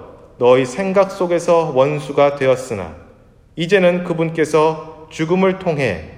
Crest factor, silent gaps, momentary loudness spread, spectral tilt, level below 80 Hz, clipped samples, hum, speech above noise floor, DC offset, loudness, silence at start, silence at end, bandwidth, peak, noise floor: 16 dB; none; 12 LU; -6 dB/octave; -50 dBFS; under 0.1%; none; 31 dB; under 0.1%; -16 LUFS; 0 s; 0 s; 12 kHz; 0 dBFS; -47 dBFS